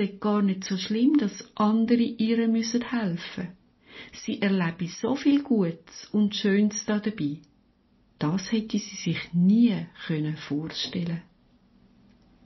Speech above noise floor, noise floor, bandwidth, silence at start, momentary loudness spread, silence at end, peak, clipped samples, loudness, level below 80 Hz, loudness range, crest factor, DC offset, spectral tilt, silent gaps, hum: 38 dB; -63 dBFS; 6.2 kHz; 0 s; 11 LU; 1.25 s; -10 dBFS; under 0.1%; -26 LUFS; -64 dBFS; 3 LU; 16 dB; under 0.1%; -5.5 dB/octave; none; none